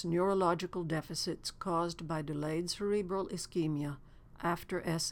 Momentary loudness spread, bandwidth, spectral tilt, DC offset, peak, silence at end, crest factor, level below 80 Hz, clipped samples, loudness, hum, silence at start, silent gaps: 7 LU; 18 kHz; -5 dB/octave; under 0.1%; -18 dBFS; 0 s; 18 dB; -58 dBFS; under 0.1%; -35 LUFS; none; 0 s; none